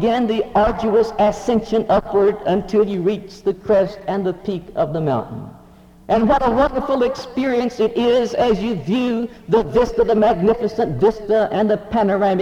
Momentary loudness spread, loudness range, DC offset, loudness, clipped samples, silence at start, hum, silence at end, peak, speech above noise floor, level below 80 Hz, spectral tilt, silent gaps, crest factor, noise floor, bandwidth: 7 LU; 3 LU; under 0.1%; -18 LUFS; under 0.1%; 0 s; none; 0 s; -4 dBFS; 28 dB; -40 dBFS; -7 dB/octave; none; 14 dB; -45 dBFS; 11 kHz